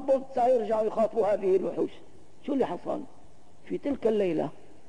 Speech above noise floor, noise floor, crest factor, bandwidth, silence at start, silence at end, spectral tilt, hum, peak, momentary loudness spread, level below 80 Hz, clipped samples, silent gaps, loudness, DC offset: 30 dB; -57 dBFS; 14 dB; 10.5 kHz; 0 s; 0.4 s; -7.5 dB/octave; none; -14 dBFS; 11 LU; -64 dBFS; under 0.1%; none; -28 LUFS; 0.8%